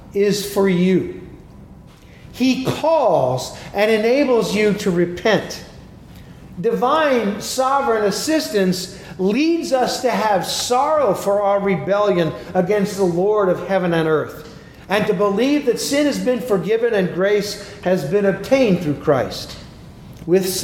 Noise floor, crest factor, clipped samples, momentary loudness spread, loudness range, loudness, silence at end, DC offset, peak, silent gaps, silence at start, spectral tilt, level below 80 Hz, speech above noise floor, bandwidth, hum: -42 dBFS; 16 dB; under 0.1%; 9 LU; 2 LU; -18 LUFS; 0 s; under 0.1%; -2 dBFS; none; 0 s; -5 dB/octave; -48 dBFS; 25 dB; 17.5 kHz; none